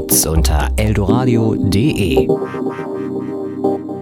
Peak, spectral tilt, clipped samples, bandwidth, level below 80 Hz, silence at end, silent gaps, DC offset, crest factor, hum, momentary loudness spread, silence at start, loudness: 0 dBFS; -5.5 dB/octave; under 0.1%; 17.5 kHz; -24 dBFS; 0 s; none; under 0.1%; 16 dB; none; 9 LU; 0 s; -16 LUFS